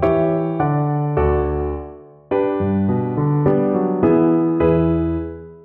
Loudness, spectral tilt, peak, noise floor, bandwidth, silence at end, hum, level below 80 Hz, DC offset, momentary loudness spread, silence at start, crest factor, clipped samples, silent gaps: -18 LUFS; -12 dB/octave; -4 dBFS; -37 dBFS; 4 kHz; 0.05 s; none; -34 dBFS; under 0.1%; 8 LU; 0 s; 14 dB; under 0.1%; none